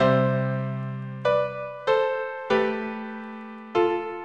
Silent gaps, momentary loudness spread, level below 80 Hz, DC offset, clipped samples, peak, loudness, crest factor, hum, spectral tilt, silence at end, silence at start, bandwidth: none; 12 LU; -62 dBFS; under 0.1%; under 0.1%; -8 dBFS; -26 LUFS; 16 dB; none; -8 dB/octave; 0 s; 0 s; 7.6 kHz